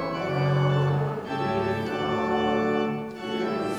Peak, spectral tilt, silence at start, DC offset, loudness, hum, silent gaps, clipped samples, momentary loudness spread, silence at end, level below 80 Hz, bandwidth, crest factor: -12 dBFS; -7.5 dB/octave; 0 s; under 0.1%; -26 LUFS; none; none; under 0.1%; 6 LU; 0 s; -56 dBFS; 9 kHz; 14 dB